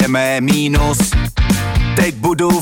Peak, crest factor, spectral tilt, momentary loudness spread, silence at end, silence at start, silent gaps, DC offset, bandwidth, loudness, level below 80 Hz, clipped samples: -2 dBFS; 12 dB; -5 dB/octave; 2 LU; 0 s; 0 s; none; under 0.1%; 17 kHz; -15 LUFS; -20 dBFS; under 0.1%